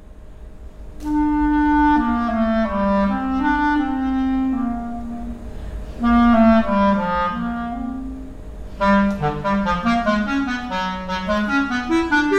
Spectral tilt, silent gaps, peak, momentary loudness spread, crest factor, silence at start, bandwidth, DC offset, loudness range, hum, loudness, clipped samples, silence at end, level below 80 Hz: -7 dB/octave; none; -4 dBFS; 15 LU; 16 dB; 0 s; 9 kHz; under 0.1%; 3 LU; none; -19 LUFS; under 0.1%; 0 s; -34 dBFS